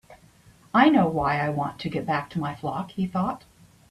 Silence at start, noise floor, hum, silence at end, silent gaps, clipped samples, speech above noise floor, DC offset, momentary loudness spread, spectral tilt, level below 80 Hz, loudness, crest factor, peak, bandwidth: 0.1 s; -55 dBFS; none; 0.55 s; none; under 0.1%; 31 dB; under 0.1%; 12 LU; -7.5 dB/octave; -54 dBFS; -25 LUFS; 22 dB; -4 dBFS; 13 kHz